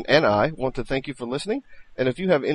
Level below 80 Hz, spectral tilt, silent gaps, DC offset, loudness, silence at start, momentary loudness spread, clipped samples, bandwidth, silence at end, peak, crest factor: -44 dBFS; -6 dB/octave; none; under 0.1%; -24 LUFS; 0 s; 11 LU; under 0.1%; 11 kHz; 0 s; -4 dBFS; 20 dB